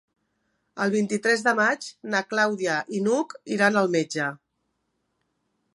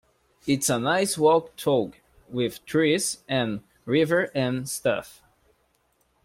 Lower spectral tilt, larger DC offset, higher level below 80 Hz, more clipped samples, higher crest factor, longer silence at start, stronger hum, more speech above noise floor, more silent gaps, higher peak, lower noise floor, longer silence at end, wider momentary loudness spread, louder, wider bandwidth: about the same, -4.5 dB/octave vs -4 dB/octave; neither; second, -78 dBFS vs -62 dBFS; neither; about the same, 22 dB vs 18 dB; first, 0.75 s vs 0.45 s; neither; first, 52 dB vs 44 dB; neither; first, -4 dBFS vs -8 dBFS; first, -76 dBFS vs -68 dBFS; first, 1.4 s vs 1.15 s; about the same, 8 LU vs 10 LU; about the same, -24 LUFS vs -24 LUFS; second, 11.5 kHz vs 16.5 kHz